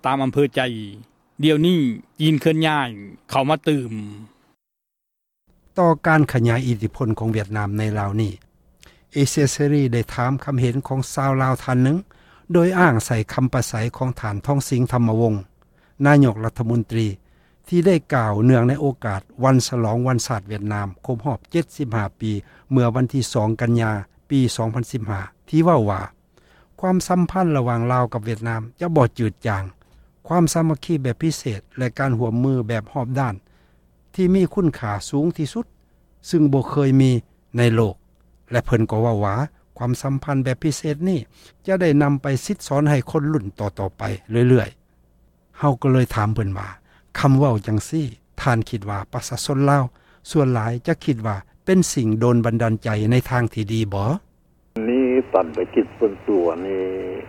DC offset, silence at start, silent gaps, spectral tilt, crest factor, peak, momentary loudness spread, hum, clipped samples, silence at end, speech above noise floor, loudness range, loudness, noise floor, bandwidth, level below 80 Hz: under 0.1%; 0.05 s; none; -6.5 dB/octave; 18 dB; -2 dBFS; 10 LU; none; under 0.1%; 0 s; 61 dB; 3 LU; -20 LUFS; -81 dBFS; 15.5 kHz; -46 dBFS